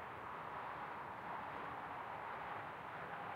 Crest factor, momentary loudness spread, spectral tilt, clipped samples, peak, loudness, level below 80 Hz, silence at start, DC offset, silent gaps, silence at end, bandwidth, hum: 14 dB; 2 LU; -5.5 dB/octave; under 0.1%; -34 dBFS; -48 LUFS; -76 dBFS; 0 s; under 0.1%; none; 0 s; 16 kHz; none